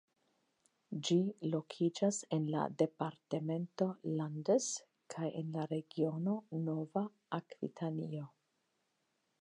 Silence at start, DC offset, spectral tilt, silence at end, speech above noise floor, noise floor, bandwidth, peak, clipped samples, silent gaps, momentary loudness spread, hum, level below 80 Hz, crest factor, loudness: 0.9 s; under 0.1%; -6 dB/octave; 1.15 s; 45 dB; -82 dBFS; 11 kHz; -18 dBFS; under 0.1%; none; 10 LU; none; -88 dBFS; 20 dB; -38 LUFS